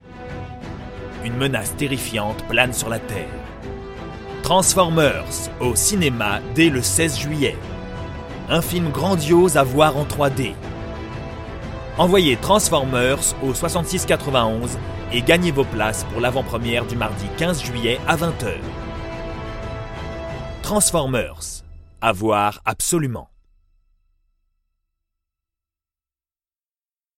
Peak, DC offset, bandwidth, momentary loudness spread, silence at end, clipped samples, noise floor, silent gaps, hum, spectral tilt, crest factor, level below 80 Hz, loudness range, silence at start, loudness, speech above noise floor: 0 dBFS; under 0.1%; 16.5 kHz; 16 LU; 3.95 s; under 0.1%; under -90 dBFS; none; none; -4 dB/octave; 22 dB; -36 dBFS; 6 LU; 0.05 s; -20 LUFS; over 71 dB